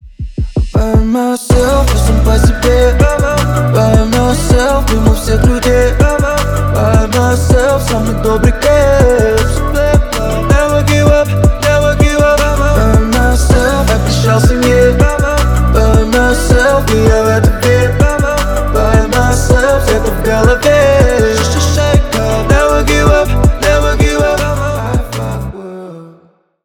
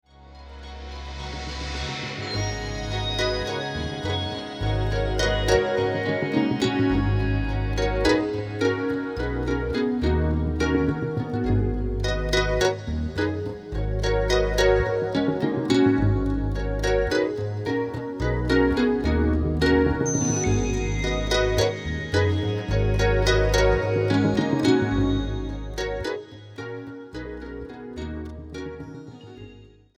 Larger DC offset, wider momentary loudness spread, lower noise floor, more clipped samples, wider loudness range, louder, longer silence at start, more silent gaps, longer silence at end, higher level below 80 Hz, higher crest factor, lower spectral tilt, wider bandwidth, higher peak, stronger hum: neither; second, 5 LU vs 15 LU; about the same, -47 dBFS vs -48 dBFS; neither; second, 1 LU vs 7 LU; first, -10 LUFS vs -24 LUFS; second, 0.05 s vs 0.2 s; neither; first, 0.55 s vs 0.3 s; first, -14 dBFS vs -32 dBFS; second, 10 dB vs 18 dB; about the same, -5.5 dB/octave vs -5.5 dB/octave; first, 19 kHz vs 13 kHz; first, 0 dBFS vs -6 dBFS; neither